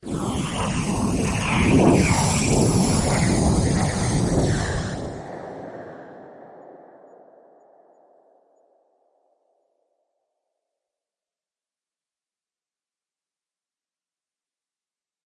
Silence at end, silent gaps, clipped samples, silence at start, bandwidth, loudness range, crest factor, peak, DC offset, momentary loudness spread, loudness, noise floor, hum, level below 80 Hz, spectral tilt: 8.5 s; none; under 0.1%; 0.05 s; 11.5 kHz; 20 LU; 22 dB; -4 dBFS; under 0.1%; 20 LU; -21 LUFS; under -90 dBFS; none; -38 dBFS; -5 dB/octave